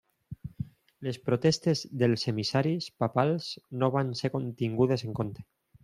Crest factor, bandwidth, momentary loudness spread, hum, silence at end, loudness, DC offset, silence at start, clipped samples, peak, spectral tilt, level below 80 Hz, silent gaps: 20 dB; 13 kHz; 15 LU; none; 0.4 s; -29 LUFS; under 0.1%; 0.3 s; under 0.1%; -8 dBFS; -6 dB/octave; -62 dBFS; none